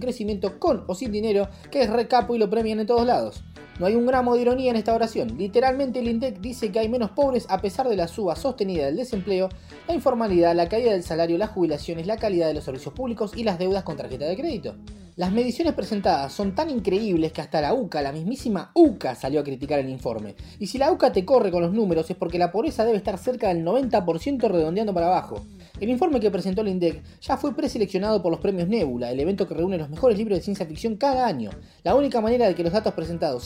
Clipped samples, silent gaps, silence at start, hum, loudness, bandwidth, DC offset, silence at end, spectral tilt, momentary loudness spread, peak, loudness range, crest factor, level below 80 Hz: under 0.1%; none; 0 s; none; -24 LUFS; 16 kHz; under 0.1%; 0 s; -6.5 dB/octave; 9 LU; -6 dBFS; 3 LU; 18 dB; -46 dBFS